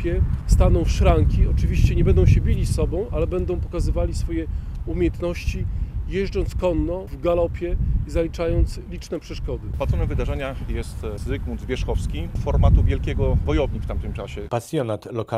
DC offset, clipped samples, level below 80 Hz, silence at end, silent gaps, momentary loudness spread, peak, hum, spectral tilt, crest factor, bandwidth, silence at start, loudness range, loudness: under 0.1%; under 0.1%; -24 dBFS; 0 s; none; 11 LU; -4 dBFS; none; -7.5 dB/octave; 18 dB; 13 kHz; 0 s; 7 LU; -23 LUFS